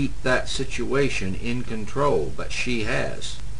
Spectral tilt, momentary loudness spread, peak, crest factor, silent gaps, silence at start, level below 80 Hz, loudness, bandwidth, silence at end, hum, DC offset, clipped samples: -4.5 dB/octave; 7 LU; -8 dBFS; 16 dB; none; 0 s; -36 dBFS; -26 LUFS; 10 kHz; 0 s; none; 6%; under 0.1%